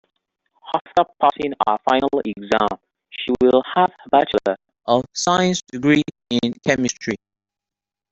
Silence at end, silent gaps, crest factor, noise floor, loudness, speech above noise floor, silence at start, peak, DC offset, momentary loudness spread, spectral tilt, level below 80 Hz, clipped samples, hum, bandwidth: 0.95 s; 0.81-0.85 s; 18 dB; -88 dBFS; -20 LUFS; 69 dB; 0.65 s; -2 dBFS; under 0.1%; 10 LU; -4.5 dB/octave; -54 dBFS; under 0.1%; none; 8.2 kHz